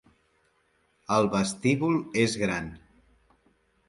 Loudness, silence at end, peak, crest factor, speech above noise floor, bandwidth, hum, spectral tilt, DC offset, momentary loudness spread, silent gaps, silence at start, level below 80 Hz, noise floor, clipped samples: -26 LUFS; 1.1 s; -10 dBFS; 20 dB; 43 dB; 11.5 kHz; none; -5 dB/octave; under 0.1%; 10 LU; none; 1.1 s; -58 dBFS; -69 dBFS; under 0.1%